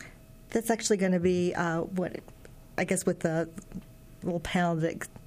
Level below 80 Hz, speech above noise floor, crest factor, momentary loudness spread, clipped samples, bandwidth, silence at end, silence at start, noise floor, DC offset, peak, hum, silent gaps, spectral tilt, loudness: -54 dBFS; 21 dB; 18 dB; 16 LU; under 0.1%; 15.5 kHz; 0 s; 0 s; -50 dBFS; under 0.1%; -14 dBFS; none; none; -5.5 dB/octave; -30 LUFS